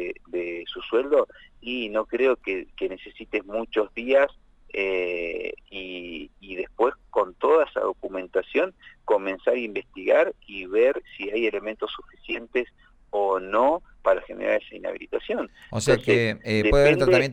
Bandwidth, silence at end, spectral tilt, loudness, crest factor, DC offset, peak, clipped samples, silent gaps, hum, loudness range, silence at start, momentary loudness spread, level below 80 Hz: 13.5 kHz; 0 s; -5.5 dB/octave; -25 LUFS; 20 dB; under 0.1%; -4 dBFS; under 0.1%; none; none; 3 LU; 0 s; 13 LU; -44 dBFS